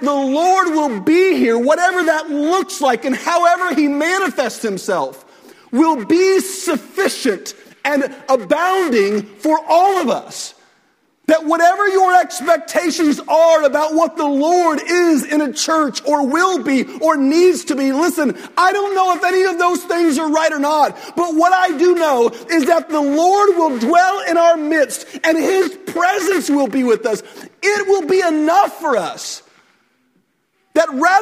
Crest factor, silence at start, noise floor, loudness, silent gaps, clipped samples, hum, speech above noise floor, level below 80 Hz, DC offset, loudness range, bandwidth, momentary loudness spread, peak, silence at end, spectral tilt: 14 dB; 0 s; -64 dBFS; -15 LUFS; none; under 0.1%; none; 49 dB; -66 dBFS; under 0.1%; 3 LU; 16 kHz; 7 LU; 0 dBFS; 0 s; -3 dB/octave